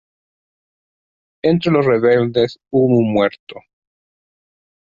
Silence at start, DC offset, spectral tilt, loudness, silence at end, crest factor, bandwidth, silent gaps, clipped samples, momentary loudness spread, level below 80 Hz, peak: 1.45 s; under 0.1%; -8.5 dB/octave; -16 LUFS; 1.3 s; 16 dB; 7.4 kHz; 3.39-3.47 s; under 0.1%; 5 LU; -54 dBFS; -2 dBFS